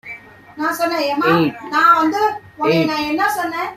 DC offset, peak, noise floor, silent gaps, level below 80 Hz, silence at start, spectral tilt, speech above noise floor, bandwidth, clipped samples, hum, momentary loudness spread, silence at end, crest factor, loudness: under 0.1%; -2 dBFS; -37 dBFS; none; -58 dBFS; 0.05 s; -5 dB/octave; 20 dB; 16 kHz; under 0.1%; none; 10 LU; 0 s; 16 dB; -17 LUFS